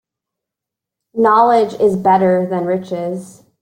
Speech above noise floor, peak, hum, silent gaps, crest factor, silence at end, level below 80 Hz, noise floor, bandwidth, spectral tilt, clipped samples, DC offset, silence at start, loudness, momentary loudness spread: 70 dB; -2 dBFS; none; none; 14 dB; 0.35 s; -60 dBFS; -84 dBFS; 15.5 kHz; -7.5 dB/octave; under 0.1%; under 0.1%; 1.15 s; -14 LUFS; 13 LU